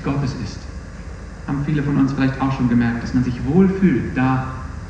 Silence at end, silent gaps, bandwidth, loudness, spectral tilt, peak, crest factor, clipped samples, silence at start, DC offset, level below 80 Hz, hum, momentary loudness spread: 0 s; none; 8.8 kHz; -19 LUFS; -8 dB/octave; -2 dBFS; 16 dB; under 0.1%; 0 s; under 0.1%; -34 dBFS; none; 18 LU